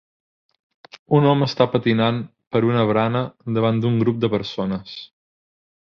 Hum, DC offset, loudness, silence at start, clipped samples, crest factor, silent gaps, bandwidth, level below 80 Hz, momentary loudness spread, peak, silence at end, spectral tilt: none; under 0.1%; -20 LUFS; 1.1 s; under 0.1%; 18 dB; 2.47-2.51 s; 6.6 kHz; -56 dBFS; 9 LU; -2 dBFS; 0.8 s; -8 dB/octave